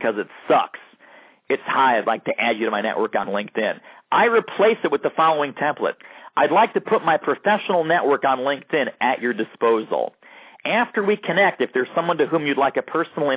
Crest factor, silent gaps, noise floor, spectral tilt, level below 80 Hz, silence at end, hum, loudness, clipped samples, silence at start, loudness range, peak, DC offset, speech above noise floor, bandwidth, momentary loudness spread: 16 dB; none; -50 dBFS; -8.5 dB/octave; -74 dBFS; 0 s; none; -21 LUFS; under 0.1%; 0 s; 2 LU; -6 dBFS; under 0.1%; 29 dB; 4 kHz; 8 LU